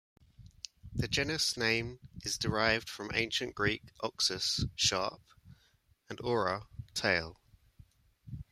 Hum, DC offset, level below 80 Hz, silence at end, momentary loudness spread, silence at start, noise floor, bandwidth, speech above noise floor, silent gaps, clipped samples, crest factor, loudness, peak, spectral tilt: none; under 0.1%; -56 dBFS; 0.1 s; 17 LU; 0.4 s; -70 dBFS; 16 kHz; 36 dB; none; under 0.1%; 22 dB; -32 LUFS; -12 dBFS; -3 dB/octave